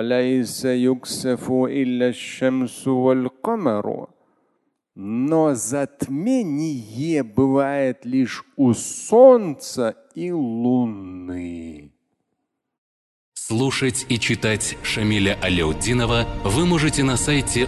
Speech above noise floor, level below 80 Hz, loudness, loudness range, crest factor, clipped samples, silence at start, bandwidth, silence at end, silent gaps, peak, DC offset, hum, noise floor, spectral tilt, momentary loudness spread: 56 dB; -40 dBFS; -20 LUFS; 8 LU; 20 dB; under 0.1%; 0 s; 12.5 kHz; 0 s; 12.78-13.32 s; -2 dBFS; under 0.1%; none; -77 dBFS; -5 dB/octave; 9 LU